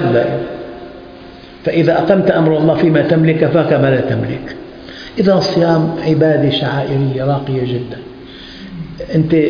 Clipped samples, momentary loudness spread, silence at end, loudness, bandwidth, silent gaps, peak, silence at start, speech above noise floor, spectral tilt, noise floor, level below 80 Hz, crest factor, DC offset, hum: under 0.1%; 20 LU; 0 s; -14 LUFS; 5.2 kHz; none; 0 dBFS; 0 s; 22 dB; -8 dB/octave; -35 dBFS; -44 dBFS; 14 dB; under 0.1%; none